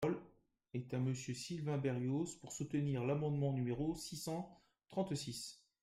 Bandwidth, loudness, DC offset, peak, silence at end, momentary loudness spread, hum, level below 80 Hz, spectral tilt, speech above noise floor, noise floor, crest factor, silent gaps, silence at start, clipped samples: 15.5 kHz; -41 LUFS; under 0.1%; -26 dBFS; 0.25 s; 9 LU; none; -68 dBFS; -6 dB/octave; 29 dB; -69 dBFS; 16 dB; none; 0 s; under 0.1%